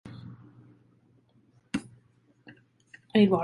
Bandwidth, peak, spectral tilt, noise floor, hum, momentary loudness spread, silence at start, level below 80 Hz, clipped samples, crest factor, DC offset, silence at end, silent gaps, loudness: 11.5 kHz; -10 dBFS; -7 dB/octave; -64 dBFS; none; 25 LU; 0.05 s; -66 dBFS; under 0.1%; 22 dB; under 0.1%; 0 s; none; -28 LUFS